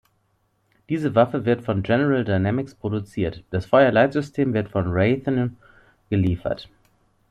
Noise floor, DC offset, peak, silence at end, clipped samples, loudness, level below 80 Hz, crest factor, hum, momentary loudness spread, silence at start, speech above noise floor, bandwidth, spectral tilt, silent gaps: -67 dBFS; under 0.1%; -4 dBFS; 0.65 s; under 0.1%; -22 LUFS; -52 dBFS; 18 dB; none; 11 LU; 0.9 s; 46 dB; 10 kHz; -8.5 dB/octave; none